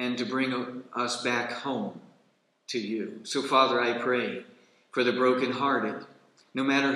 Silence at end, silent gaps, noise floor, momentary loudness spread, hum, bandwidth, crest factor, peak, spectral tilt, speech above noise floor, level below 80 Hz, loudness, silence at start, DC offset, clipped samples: 0 s; none; -68 dBFS; 11 LU; none; 12 kHz; 20 dB; -8 dBFS; -4 dB/octave; 40 dB; -86 dBFS; -28 LUFS; 0 s; under 0.1%; under 0.1%